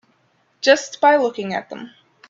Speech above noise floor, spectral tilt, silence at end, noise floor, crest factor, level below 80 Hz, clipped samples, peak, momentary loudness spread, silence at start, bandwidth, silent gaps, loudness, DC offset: 44 dB; -3 dB/octave; 0.4 s; -62 dBFS; 20 dB; -70 dBFS; under 0.1%; 0 dBFS; 17 LU; 0.65 s; 7.8 kHz; none; -18 LUFS; under 0.1%